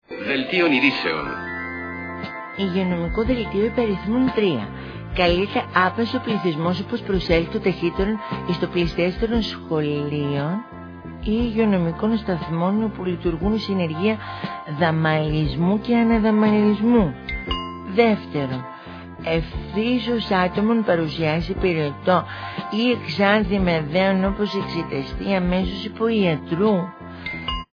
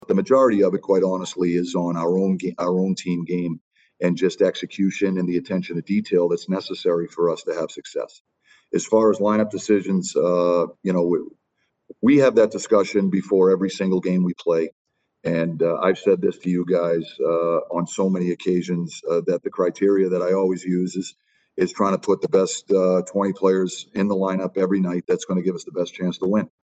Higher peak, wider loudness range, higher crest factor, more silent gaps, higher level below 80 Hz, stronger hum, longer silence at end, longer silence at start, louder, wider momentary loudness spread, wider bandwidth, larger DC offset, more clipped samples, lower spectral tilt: about the same, -2 dBFS vs -4 dBFS; about the same, 4 LU vs 3 LU; about the same, 20 dB vs 16 dB; second, none vs 3.61-3.71 s, 8.20-8.25 s, 14.72-14.85 s; first, -38 dBFS vs -64 dBFS; neither; about the same, 0.1 s vs 0.15 s; about the same, 0.1 s vs 0.1 s; about the same, -22 LUFS vs -21 LUFS; first, 11 LU vs 8 LU; second, 5.4 kHz vs 9 kHz; neither; neither; first, -8 dB/octave vs -6.5 dB/octave